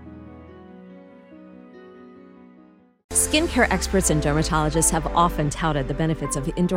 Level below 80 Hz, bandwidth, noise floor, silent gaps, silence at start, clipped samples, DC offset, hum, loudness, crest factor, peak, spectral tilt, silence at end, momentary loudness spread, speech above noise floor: -34 dBFS; 16 kHz; -52 dBFS; 3.04-3.09 s; 0 s; under 0.1%; under 0.1%; none; -21 LUFS; 18 dB; -6 dBFS; -4 dB/octave; 0 s; 7 LU; 31 dB